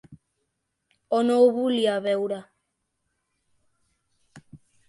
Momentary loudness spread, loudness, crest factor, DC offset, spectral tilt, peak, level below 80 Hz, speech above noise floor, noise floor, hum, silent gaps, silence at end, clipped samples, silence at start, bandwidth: 10 LU; -23 LUFS; 20 dB; under 0.1%; -5.5 dB/octave; -8 dBFS; -72 dBFS; 56 dB; -78 dBFS; none; none; 0.3 s; under 0.1%; 0.1 s; 11.5 kHz